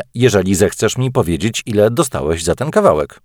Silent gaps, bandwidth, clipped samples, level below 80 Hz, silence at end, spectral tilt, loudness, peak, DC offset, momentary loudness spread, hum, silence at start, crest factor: none; 19 kHz; under 0.1%; -38 dBFS; 0.2 s; -5 dB/octave; -15 LUFS; 0 dBFS; under 0.1%; 5 LU; none; 0 s; 14 dB